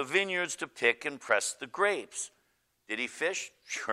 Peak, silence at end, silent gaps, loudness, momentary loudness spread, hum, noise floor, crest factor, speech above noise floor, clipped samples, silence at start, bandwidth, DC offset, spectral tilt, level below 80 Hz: -10 dBFS; 0 s; none; -31 LUFS; 10 LU; none; -74 dBFS; 22 dB; 42 dB; under 0.1%; 0 s; 15.5 kHz; under 0.1%; -1.5 dB/octave; -80 dBFS